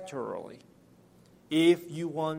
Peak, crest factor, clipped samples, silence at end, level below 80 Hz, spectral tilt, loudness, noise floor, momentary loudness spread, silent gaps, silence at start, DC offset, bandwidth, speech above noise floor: -12 dBFS; 20 dB; under 0.1%; 0 s; -76 dBFS; -5.5 dB/octave; -28 LUFS; -59 dBFS; 16 LU; none; 0 s; under 0.1%; 16 kHz; 30 dB